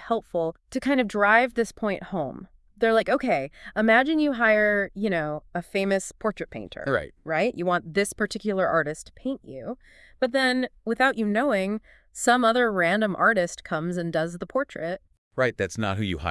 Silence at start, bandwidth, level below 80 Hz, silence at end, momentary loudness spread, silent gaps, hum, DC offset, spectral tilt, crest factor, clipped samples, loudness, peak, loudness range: 0 s; 12 kHz; -54 dBFS; 0 s; 13 LU; 15.18-15.31 s; none; under 0.1%; -5 dB/octave; 20 dB; under 0.1%; -25 LUFS; -4 dBFS; 4 LU